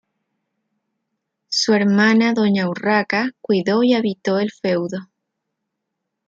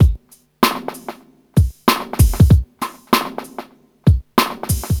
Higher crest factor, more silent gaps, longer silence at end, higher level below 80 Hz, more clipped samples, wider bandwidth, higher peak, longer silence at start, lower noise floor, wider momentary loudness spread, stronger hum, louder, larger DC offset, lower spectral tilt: about the same, 16 dB vs 16 dB; neither; first, 1.25 s vs 0 s; second, -68 dBFS vs -22 dBFS; neither; second, 7.8 kHz vs over 20 kHz; second, -4 dBFS vs 0 dBFS; first, 1.5 s vs 0 s; first, -78 dBFS vs -36 dBFS; second, 8 LU vs 18 LU; neither; about the same, -18 LUFS vs -17 LUFS; neither; about the same, -5 dB/octave vs -5.5 dB/octave